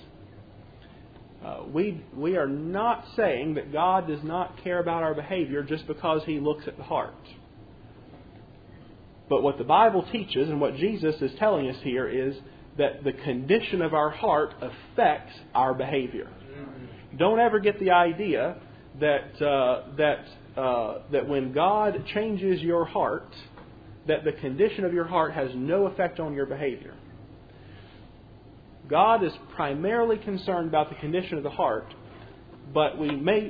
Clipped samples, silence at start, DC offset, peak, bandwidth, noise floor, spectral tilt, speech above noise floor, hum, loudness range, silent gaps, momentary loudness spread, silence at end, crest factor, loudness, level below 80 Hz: under 0.1%; 0.15 s; under 0.1%; -8 dBFS; 5 kHz; -49 dBFS; -9 dB/octave; 23 dB; none; 5 LU; none; 12 LU; 0 s; 20 dB; -26 LUFS; -56 dBFS